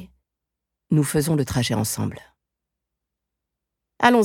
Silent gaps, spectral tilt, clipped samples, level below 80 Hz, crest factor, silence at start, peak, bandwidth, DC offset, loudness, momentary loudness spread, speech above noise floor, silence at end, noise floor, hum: none; -5 dB/octave; under 0.1%; -52 dBFS; 22 dB; 0 s; -2 dBFS; 17.5 kHz; under 0.1%; -22 LUFS; 7 LU; 62 dB; 0 s; -84 dBFS; none